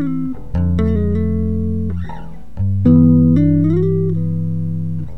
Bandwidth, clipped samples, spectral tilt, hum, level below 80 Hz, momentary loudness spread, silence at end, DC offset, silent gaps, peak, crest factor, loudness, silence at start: 4 kHz; under 0.1%; -11.5 dB/octave; none; -32 dBFS; 12 LU; 0 s; 5%; none; 0 dBFS; 14 dB; -16 LUFS; 0 s